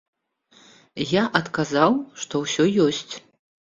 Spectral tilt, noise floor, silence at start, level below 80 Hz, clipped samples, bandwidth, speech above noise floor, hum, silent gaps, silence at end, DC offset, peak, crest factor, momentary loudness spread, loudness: -4.5 dB/octave; -58 dBFS; 0.95 s; -62 dBFS; under 0.1%; 7.8 kHz; 36 dB; none; none; 0.45 s; under 0.1%; 0 dBFS; 24 dB; 15 LU; -22 LUFS